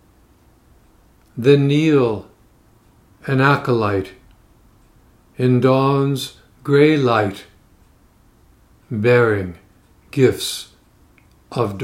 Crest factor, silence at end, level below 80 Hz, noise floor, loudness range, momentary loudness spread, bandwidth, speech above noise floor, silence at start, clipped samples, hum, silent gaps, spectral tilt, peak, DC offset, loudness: 20 dB; 0 s; -54 dBFS; -53 dBFS; 3 LU; 17 LU; 16 kHz; 37 dB; 1.35 s; under 0.1%; none; none; -6.5 dB/octave; 0 dBFS; under 0.1%; -17 LUFS